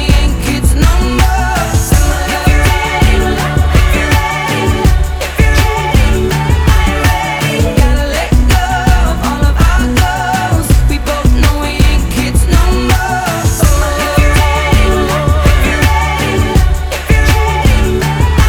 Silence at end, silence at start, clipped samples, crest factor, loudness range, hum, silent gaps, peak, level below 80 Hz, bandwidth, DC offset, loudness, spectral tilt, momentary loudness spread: 0 s; 0 s; under 0.1%; 10 dB; 1 LU; none; none; 0 dBFS; -12 dBFS; over 20 kHz; under 0.1%; -11 LUFS; -5 dB/octave; 3 LU